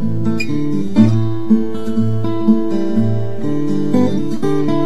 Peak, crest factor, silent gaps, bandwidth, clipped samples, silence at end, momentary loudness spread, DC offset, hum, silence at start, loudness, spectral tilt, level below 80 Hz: 0 dBFS; 16 dB; none; 10.5 kHz; under 0.1%; 0 s; 6 LU; 10%; none; 0 s; -17 LUFS; -8.5 dB/octave; -48 dBFS